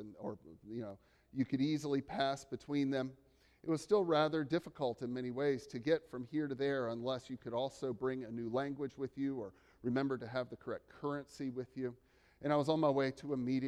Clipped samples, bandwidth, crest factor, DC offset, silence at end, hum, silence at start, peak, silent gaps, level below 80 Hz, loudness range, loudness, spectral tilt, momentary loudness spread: under 0.1%; 12 kHz; 20 dB; under 0.1%; 0 s; none; 0 s; -18 dBFS; none; -72 dBFS; 4 LU; -38 LUFS; -6.5 dB/octave; 13 LU